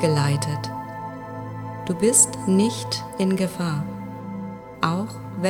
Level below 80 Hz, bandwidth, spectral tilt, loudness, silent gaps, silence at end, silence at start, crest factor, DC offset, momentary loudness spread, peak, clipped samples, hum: -58 dBFS; 19 kHz; -4.5 dB/octave; -23 LUFS; none; 0 s; 0 s; 20 dB; under 0.1%; 17 LU; -2 dBFS; under 0.1%; none